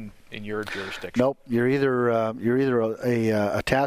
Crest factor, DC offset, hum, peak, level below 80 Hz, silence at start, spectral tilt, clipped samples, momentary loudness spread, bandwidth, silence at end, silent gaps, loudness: 18 dB; under 0.1%; none; -6 dBFS; -52 dBFS; 0 s; -6.5 dB/octave; under 0.1%; 10 LU; 15.5 kHz; 0 s; none; -24 LUFS